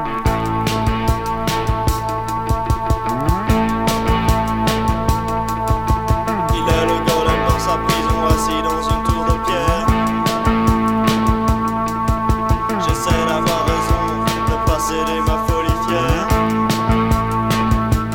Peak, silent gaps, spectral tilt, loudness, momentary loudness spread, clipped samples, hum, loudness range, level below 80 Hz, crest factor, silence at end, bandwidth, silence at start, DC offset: 0 dBFS; none; -5.5 dB/octave; -17 LUFS; 3 LU; under 0.1%; none; 1 LU; -24 dBFS; 16 dB; 0 s; 18 kHz; 0 s; under 0.1%